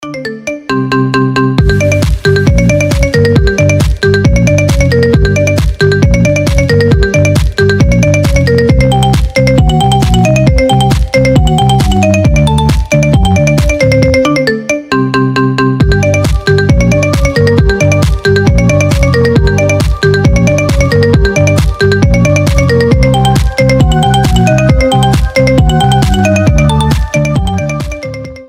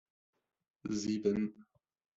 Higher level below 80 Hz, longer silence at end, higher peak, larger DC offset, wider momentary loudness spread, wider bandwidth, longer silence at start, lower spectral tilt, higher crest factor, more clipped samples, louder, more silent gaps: first, -16 dBFS vs -70 dBFS; second, 0.05 s vs 0.55 s; first, 0 dBFS vs -18 dBFS; neither; second, 3 LU vs 8 LU; first, 16 kHz vs 7.8 kHz; second, 0 s vs 0.85 s; about the same, -6 dB/octave vs -6 dB/octave; second, 8 dB vs 20 dB; first, 0.4% vs under 0.1%; first, -9 LUFS vs -36 LUFS; neither